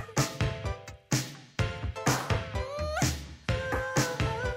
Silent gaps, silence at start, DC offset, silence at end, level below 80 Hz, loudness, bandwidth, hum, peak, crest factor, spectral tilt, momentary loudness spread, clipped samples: none; 0 s; under 0.1%; 0 s; -42 dBFS; -31 LUFS; 16 kHz; none; -12 dBFS; 18 dB; -4.5 dB/octave; 8 LU; under 0.1%